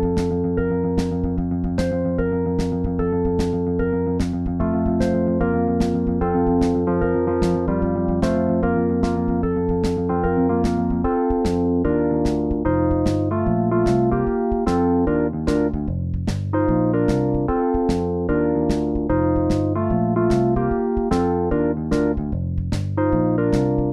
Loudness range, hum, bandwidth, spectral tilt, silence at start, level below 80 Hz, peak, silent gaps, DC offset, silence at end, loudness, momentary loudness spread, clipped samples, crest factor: 2 LU; none; 11.5 kHz; -8.5 dB/octave; 0 s; -32 dBFS; -4 dBFS; none; under 0.1%; 0 s; -21 LUFS; 4 LU; under 0.1%; 14 dB